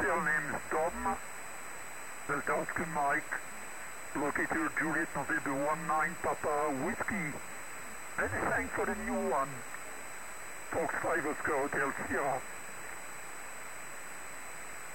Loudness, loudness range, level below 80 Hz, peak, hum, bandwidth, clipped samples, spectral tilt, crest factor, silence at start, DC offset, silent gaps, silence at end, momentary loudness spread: -35 LUFS; 3 LU; -60 dBFS; -20 dBFS; none; 16 kHz; under 0.1%; -4 dB/octave; 14 dB; 0 s; 0.6%; none; 0 s; 12 LU